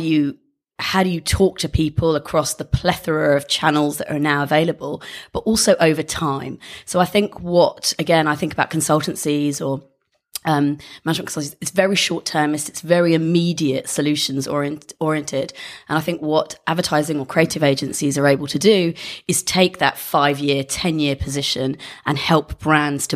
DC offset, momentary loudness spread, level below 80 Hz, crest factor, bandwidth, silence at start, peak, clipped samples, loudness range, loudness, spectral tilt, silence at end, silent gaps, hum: under 0.1%; 9 LU; -40 dBFS; 18 dB; 15.5 kHz; 0 s; 0 dBFS; under 0.1%; 3 LU; -19 LUFS; -4.5 dB/octave; 0 s; none; none